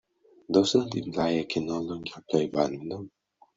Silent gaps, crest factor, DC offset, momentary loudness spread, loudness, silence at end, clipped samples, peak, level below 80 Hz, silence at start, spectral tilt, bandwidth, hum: none; 20 dB; under 0.1%; 14 LU; -28 LUFS; 0.5 s; under 0.1%; -8 dBFS; -64 dBFS; 0.5 s; -5.5 dB/octave; 7.8 kHz; none